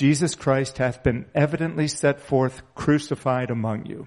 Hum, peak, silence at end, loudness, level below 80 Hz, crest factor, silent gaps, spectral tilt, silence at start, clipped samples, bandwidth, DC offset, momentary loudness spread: none; -6 dBFS; 0 s; -24 LUFS; -46 dBFS; 18 dB; none; -6 dB/octave; 0 s; under 0.1%; 11.5 kHz; under 0.1%; 5 LU